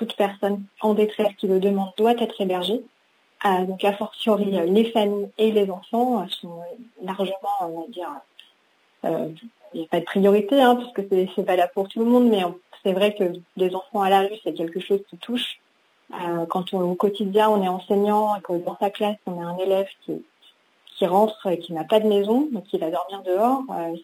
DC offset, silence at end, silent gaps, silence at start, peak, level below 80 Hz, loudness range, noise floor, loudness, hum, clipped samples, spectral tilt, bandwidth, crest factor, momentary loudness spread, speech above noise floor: under 0.1%; 0 s; none; 0 s; -4 dBFS; -78 dBFS; 5 LU; -63 dBFS; -23 LUFS; none; under 0.1%; -6.5 dB/octave; 16 kHz; 20 dB; 12 LU; 41 dB